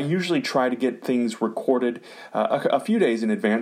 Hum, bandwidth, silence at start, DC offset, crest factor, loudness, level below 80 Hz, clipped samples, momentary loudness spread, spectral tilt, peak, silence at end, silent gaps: none; 14.5 kHz; 0 s; under 0.1%; 16 dB; -23 LUFS; -76 dBFS; under 0.1%; 5 LU; -6 dB/octave; -8 dBFS; 0 s; none